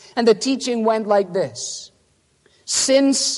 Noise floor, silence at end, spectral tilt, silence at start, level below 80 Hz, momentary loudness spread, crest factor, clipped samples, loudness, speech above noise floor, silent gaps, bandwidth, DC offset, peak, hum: -61 dBFS; 0 s; -2.5 dB/octave; 0.15 s; -68 dBFS; 13 LU; 18 dB; under 0.1%; -19 LUFS; 43 dB; none; 11.5 kHz; under 0.1%; -2 dBFS; none